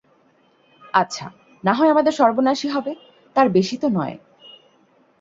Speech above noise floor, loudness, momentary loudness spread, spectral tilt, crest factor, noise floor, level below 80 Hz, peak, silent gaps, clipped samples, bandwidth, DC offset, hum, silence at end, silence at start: 40 dB; -19 LUFS; 16 LU; -5.5 dB/octave; 20 dB; -58 dBFS; -64 dBFS; -2 dBFS; none; under 0.1%; 7.8 kHz; under 0.1%; none; 1.05 s; 0.95 s